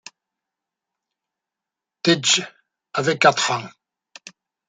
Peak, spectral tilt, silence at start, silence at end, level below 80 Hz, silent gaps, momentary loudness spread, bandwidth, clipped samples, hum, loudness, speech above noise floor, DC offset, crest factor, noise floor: -2 dBFS; -2.5 dB/octave; 2.05 s; 1 s; -72 dBFS; none; 14 LU; 9.6 kHz; under 0.1%; none; -19 LUFS; 68 dB; under 0.1%; 22 dB; -87 dBFS